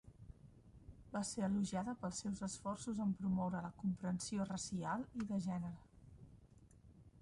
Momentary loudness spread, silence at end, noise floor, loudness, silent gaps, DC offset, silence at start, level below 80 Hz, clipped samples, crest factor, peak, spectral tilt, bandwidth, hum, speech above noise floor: 22 LU; 0 s; -64 dBFS; -42 LUFS; none; under 0.1%; 0.05 s; -66 dBFS; under 0.1%; 14 dB; -30 dBFS; -5.5 dB/octave; 11 kHz; none; 23 dB